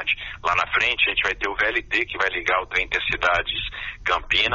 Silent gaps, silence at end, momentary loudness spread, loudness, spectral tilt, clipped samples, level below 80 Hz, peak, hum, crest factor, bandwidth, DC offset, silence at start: none; 0 s; 5 LU; -22 LUFS; 1 dB/octave; under 0.1%; -42 dBFS; -6 dBFS; none; 16 dB; 7.2 kHz; under 0.1%; 0 s